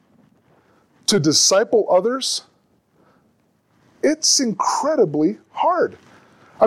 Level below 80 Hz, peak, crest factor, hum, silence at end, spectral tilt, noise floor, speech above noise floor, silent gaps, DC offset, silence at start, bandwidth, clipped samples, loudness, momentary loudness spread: -66 dBFS; -4 dBFS; 16 dB; none; 0 s; -3 dB/octave; -62 dBFS; 44 dB; none; under 0.1%; 1.1 s; 16 kHz; under 0.1%; -18 LUFS; 9 LU